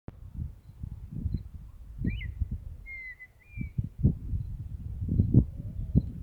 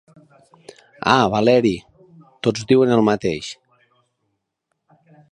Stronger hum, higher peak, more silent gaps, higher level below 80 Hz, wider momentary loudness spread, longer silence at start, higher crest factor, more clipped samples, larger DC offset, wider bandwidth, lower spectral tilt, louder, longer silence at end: neither; second, -8 dBFS vs 0 dBFS; neither; first, -38 dBFS vs -54 dBFS; first, 19 LU vs 15 LU; second, 0.1 s vs 1.05 s; about the same, 24 dB vs 20 dB; neither; neither; second, 4.3 kHz vs 10.5 kHz; first, -10 dB/octave vs -6 dB/octave; second, -33 LUFS vs -18 LUFS; second, 0 s vs 1.8 s